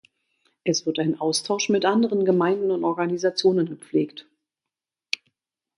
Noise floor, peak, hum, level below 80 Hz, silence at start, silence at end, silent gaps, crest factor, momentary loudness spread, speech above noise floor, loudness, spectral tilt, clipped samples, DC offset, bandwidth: -88 dBFS; -2 dBFS; none; -72 dBFS; 0.65 s; 1.55 s; none; 22 dB; 10 LU; 66 dB; -23 LUFS; -4.5 dB/octave; under 0.1%; under 0.1%; 11 kHz